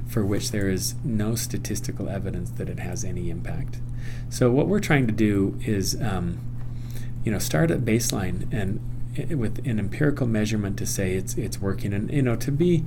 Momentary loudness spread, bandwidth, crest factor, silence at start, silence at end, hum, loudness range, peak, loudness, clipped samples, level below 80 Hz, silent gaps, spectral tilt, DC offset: 11 LU; 18.5 kHz; 22 dB; 0 s; 0 s; none; 4 LU; -4 dBFS; -26 LUFS; under 0.1%; -36 dBFS; none; -5.5 dB/octave; under 0.1%